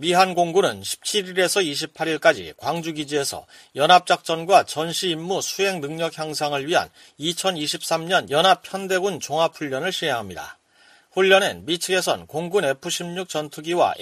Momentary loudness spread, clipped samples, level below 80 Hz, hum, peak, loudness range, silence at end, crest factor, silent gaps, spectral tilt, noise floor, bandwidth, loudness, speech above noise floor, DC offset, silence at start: 10 LU; under 0.1%; -66 dBFS; none; -2 dBFS; 3 LU; 0 s; 20 dB; none; -3 dB/octave; -55 dBFS; 15.5 kHz; -22 LUFS; 33 dB; under 0.1%; 0 s